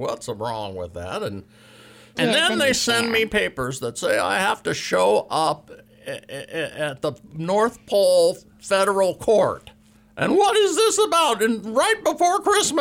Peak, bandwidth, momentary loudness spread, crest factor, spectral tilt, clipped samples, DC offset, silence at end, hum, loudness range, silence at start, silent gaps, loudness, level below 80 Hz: -8 dBFS; 16.5 kHz; 14 LU; 12 dB; -3 dB/octave; under 0.1%; under 0.1%; 0 s; none; 4 LU; 0 s; none; -21 LUFS; -54 dBFS